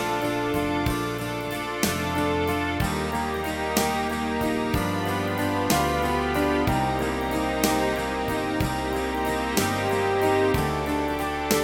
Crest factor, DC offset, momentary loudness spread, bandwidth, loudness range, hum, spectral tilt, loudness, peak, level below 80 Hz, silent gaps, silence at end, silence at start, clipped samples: 20 dB; under 0.1%; 4 LU; over 20 kHz; 2 LU; none; -4.5 dB/octave; -25 LUFS; -6 dBFS; -40 dBFS; none; 0 s; 0 s; under 0.1%